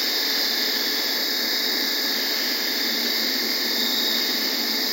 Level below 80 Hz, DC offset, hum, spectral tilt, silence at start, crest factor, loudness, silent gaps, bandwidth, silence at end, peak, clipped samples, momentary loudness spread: under -90 dBFS; under 0.1%; none; 0.5 dB/octave; 0 s; 14 dB; -21 LUFS; none; 16.5 kHz; 0 s; -10 dBFS; under 0.1%; 1 LU